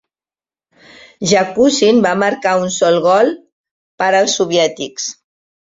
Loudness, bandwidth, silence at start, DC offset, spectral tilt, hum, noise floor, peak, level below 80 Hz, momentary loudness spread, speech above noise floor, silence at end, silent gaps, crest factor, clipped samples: -14 LUFS; 7.8 kHz; 1.2 s; under 0.1%; -3.5 dB/octave; none; under -90 dBFS; 0 dBFS; -58 dBFS; 11 LU; over 77 dB; 0.55 s; 3.52-3.64 s, 3.71-3.98 s; 14 dB; under 0.1%